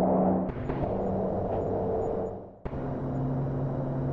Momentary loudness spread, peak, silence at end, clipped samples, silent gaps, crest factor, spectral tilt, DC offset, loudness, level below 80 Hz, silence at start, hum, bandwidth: 8 LU; -14 dBFS; 0 s; under 0.1%; none; 14 dB; -11.5 dB/octave; under 0.1%; -30 LUFS; -44 dBFS; 0 s; none; 4.2 kHz